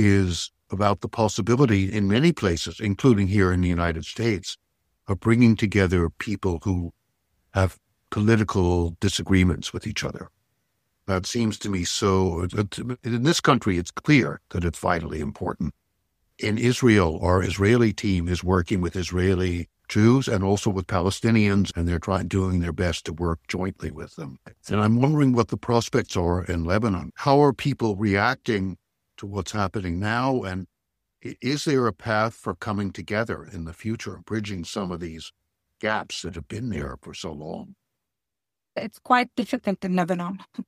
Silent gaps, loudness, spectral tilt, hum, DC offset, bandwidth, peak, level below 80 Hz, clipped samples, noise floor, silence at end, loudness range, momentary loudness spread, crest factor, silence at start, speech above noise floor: none; -24 LUFS; -6 dB/octave; none; under 0.1%; 14.5 kHz; -2 dBFS; -44 dBFS; under 0.1%; -87 dBFS; 0.05 s; 8 LU; 14 LU; 22 dB; 0 s; 64 dB